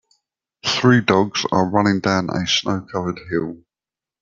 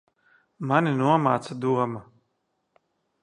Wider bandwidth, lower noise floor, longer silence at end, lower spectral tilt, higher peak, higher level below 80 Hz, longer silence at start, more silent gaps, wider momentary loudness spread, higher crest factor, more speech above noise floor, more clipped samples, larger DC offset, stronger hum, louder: second, 7.6 kHz vs 11 kHz; first, -90 dBFS vs -75 dBFS; second, 0.65 s vs 1.2 s; second, -5 dB/octave vs -7.5 dB/octave; first, -2 dBFS vs -6 dBFS; first, -56 dBFS vs -70 dBFS; about the same, 0.65 s vs 0.6 s; neither; about the same, 10 LU vs 11 LU; about the same, 18 dB vs 22 dB; first, 71 dB vs 52 dB; neither; neither; neither; first, -19 LUFS vs -24 LUFS